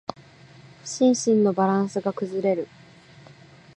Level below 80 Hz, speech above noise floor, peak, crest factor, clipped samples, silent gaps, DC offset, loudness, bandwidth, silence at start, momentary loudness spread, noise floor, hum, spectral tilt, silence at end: -68 dBFS; 27 dB; -8 dBFS; 16 dB; under 0.1%; none; under 0.1%; -23 LUFS; 10.5 kHz; 0.85 s; 17 LU; -49 dBFS; none; -5.5 dB/octave; 1.1 s